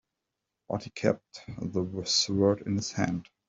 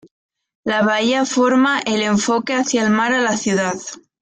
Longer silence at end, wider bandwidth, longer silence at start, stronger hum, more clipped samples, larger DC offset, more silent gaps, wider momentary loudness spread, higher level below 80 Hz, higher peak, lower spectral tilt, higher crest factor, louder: about the same, 0.25 s vs 0.25 s; second, 8.2 kHz vs 9.6 kHz; about the same, 0.7 s vs 0.65 s; neither; neither; neither; neither; first, 11 LU vs 7 LU; about the same, -62 dBFS vs -60 dBFS; second, -10 dBFS vs -4 dBFS; about the same, -4.5 dB/octave vs -3.5 dB/octave; first, 20 dB vs 14 dB; second, -29 LUFS vs -17 LUFS